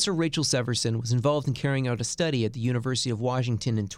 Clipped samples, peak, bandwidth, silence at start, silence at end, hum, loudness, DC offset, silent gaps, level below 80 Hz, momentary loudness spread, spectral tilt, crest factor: under 0.1%; -10 dBFS; 13.5 kHz; 0 s; 0 s; none; -26 LUFS; under 0.1%; none; -54 dBFS; 3 LU; -5 dB/octave; 16 dB